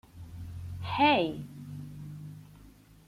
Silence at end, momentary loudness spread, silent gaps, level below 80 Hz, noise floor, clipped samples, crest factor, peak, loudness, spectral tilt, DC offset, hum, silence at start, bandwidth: 0.35 s; 22 LU; none; -56 dBFS; -55 dBFS; under 0.1%; 22 dB; -12 dBFS; -28 LUFS; -6.5 dB/octave; under 0.1%; none; 0.15 s; 16 kHz